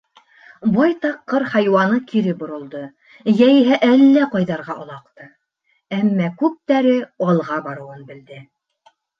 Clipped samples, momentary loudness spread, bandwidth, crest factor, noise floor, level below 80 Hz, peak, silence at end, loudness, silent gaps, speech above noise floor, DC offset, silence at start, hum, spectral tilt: under 0.1%; 21 LU; 6.4 kHz; 16 dB; -67 dBFS; -64 dBFS; -2 dBFS; 0.75 s; -17 LUFS; none; 50 dB; under 0.1%; 0.65 s; none; -8 dB/octave